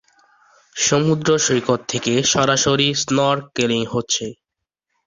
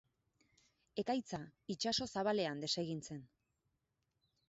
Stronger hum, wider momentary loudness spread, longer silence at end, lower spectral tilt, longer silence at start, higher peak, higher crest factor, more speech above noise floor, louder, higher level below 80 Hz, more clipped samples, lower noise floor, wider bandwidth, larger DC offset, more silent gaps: neither; second, 6 LU vs 11 LU; second, 0.75 s vs 1.25 s; about the same, -3.5 dB/octave vs -3.5 dB/octave; second, 0.75 s vs 0.95 s; first, -2 dBFS vs -24 dBFS; about the same, 18 dB vs 18 dB; first, 63 dB vs 45 dB; first, -18 LUFS vs -40 LUFS; first, -54 dBFS vs -74 dBFS; neither; second, -81 dBFS vs -85 dBFS; about the same, 7.8 kHz vs 8 kHz; neither; neither